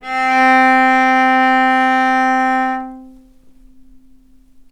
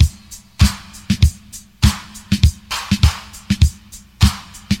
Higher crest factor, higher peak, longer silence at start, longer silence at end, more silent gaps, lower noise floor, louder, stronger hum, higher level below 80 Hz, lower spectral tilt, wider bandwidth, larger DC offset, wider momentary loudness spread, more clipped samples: about the same, 14 dB vs 16 dB; about the same, 0 dBFS vs 0 dBFS; about the same, 0.05 s vs 0 s; first, 1.6 s vs 0 s; neither; first, -46 dBFS vs -40 dBFS; first, -12 LUFS vs -18 LUFS; neither; second, -52 dBFS vs -22 dBFS; second, -2.5 dB/octave vs -4.5 dB/octave; second, 10.5 kHz vs 16.5 kHz; neither; second, 8 LU vs 18 LU; neither